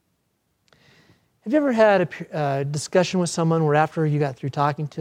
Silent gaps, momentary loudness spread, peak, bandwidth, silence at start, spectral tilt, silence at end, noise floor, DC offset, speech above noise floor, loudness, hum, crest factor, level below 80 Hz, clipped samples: none; 9 LU; -4 dBFS; 12 kHz; 1.45 s; -6 dB/octave; 0 s; -71 dBFS; under 0.1%; 50 dB; -21 LUFS; none; 20 dB; -68 dBFS; under 0.1%